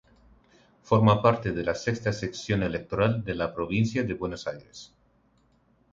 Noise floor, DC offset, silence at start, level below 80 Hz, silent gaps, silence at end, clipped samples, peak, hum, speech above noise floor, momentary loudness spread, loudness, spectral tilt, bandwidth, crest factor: -65 dBFS; under 0.1%; 0.85 s; -50 dBFS; none; 1.05 s; under 0.1%; -6 dBFS; none; 39 dB; 14 LU; -27 LUFS; -6.5 dB/octave; 7.6 kHz; 22 dB